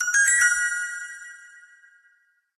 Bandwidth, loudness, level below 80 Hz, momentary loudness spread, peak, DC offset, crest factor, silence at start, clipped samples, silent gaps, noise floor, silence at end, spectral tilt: 14 kHz; -20 LUFS; -66 dBFS; 22 LU; -8 dBFS; under 0.1%; 18 dB; 0 s; under 0.1%; none; -64 dBFS; 1.15 s; 5.5 dB/octave